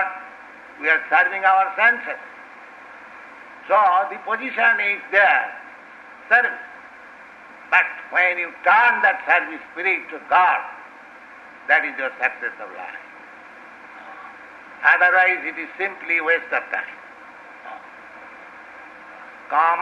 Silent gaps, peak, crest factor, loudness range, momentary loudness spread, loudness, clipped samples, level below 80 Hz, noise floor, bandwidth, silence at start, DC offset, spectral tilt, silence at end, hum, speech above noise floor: none; -2 dBFS; 20 dB; 7 LU; 25 LU; -18 LUFS; under 0.1%; -72 dBFS; -43 dBFS; 8 kHz; 0 s; under 0.1%; -3 dB/octave; 0 s; none; 23 dB